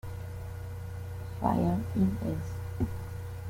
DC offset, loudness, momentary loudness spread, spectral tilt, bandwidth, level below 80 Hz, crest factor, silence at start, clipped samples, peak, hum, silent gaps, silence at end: under 0.1%; -33 LUFS; 12 LU; -8.5 dB/octave; 16.5 kHz; -48 dBFS; 20 dB; 0.05 s; under 0.1%; -14 dBFS; none; none; 0 s